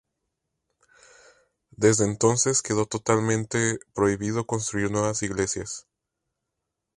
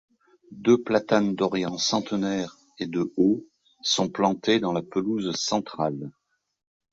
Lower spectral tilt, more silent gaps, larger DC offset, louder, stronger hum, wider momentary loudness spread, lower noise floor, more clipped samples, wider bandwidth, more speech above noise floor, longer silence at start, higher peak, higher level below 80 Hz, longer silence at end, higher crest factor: about the same, -4.5 dB/octave vs -4.5 dB/octave; neither; neither; about the same, -24 LUFS vs -25 LUFS; neither; about the same, 7 LU vs 9 LU; first, -83 dBFS vs -49 dBFS; neither; first, 11.5 kHz vs 7.8 kHz; first, 59 dB vs 25 dB; first, 1.8 s vs 0.5 s; about the same, -6 dBFS vs -6 dBFS; first, -54 dBFS vs -64 dBFS; first, 1.15 s vs 0.85 s; about the same, 22 dB vs 20 dB